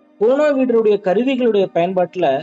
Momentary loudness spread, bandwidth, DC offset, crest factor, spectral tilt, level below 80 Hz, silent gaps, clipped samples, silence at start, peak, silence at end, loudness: 3 LU; 7.6 kHz; under 0.1%; 10 dB; -7 dB/octave; -68 dBFS; none; under 0.1%; 0.2 s; -6 dBFS; 0 s; -16 LUFS